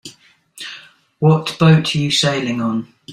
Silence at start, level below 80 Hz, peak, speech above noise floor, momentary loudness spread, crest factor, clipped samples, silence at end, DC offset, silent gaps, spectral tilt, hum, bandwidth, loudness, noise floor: 0.05 s; -54 dBFS; -2 dBFS; 31 dB; 19 LU; 16 dB; under 0.1%; 0 s; under 0.1%; none; -5.5 dB/octave; none; 12 kHz; -16 LUFS; -47 dBFS